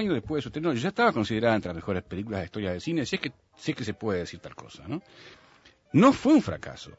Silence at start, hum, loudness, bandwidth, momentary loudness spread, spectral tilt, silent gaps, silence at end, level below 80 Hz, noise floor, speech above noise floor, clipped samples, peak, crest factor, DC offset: 0 s; none; -27 LUFS; 8 kHz; 17 LU; -6.5 dB/octave; none; 0.05 s; -56 dBFS; -58 dBFS; 31 dB; under 0.1%; -8 dBFS; 20 dB; under 0.1%